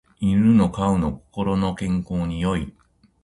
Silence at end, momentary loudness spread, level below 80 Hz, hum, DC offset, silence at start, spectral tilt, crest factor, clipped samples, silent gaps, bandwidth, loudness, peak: 0.55 s; 11 LU; -40 dBFS; none; under 0.1%; 0.2 s; -8 dB/octave; 16 dB; under 0.1%; none; 11.5 kHz; -22 LUFS; -6 dBFS